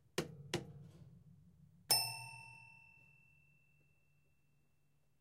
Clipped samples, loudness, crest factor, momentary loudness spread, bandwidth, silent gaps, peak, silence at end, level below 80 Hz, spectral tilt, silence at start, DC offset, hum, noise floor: under 0.1%; -39 LUFS; 28 dB; 27 LU; 15.5 kHz; none; -18 dBFS; 2.3 s; -76 dBFS; -2 dB/octave; 0.15 s; under 0.1%; none; -79 dBFS